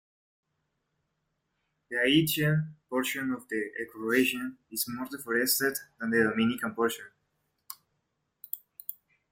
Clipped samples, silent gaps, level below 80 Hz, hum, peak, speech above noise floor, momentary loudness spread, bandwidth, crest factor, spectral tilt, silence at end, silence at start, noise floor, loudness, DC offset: under 0.1%; none; -70 dBFS; none; -10 dBFS; 51 dB; 16 LU; 16.5 kHz; 20 dB; -4 dB/octave; 0.4 s; 1.9 s; -80 dBFS; -29 LUFS; under 0.1%